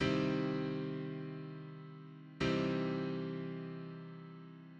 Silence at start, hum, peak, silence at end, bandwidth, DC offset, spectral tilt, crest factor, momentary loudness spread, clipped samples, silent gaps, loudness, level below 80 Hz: 0 s; none; -22 dBFS; 0 s; 8.4 kHz; under 0.1%; -7 dB/octave; 18 dB; 17 LU; under 0.1%; none; -39 LUFS; -64 dBFS